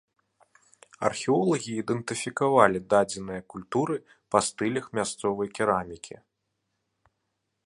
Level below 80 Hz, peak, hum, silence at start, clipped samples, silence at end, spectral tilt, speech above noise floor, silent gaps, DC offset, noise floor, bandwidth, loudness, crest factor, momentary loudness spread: -62 dBFS; -2 dBFS; none; 1 s; under 0.1%; 1.5 s; -4.5 dB/octave; 53 dB; none; under 0.1%; -80 dBFS; 11.5 kHz; -27 LUFS; 26 dB; 14 LU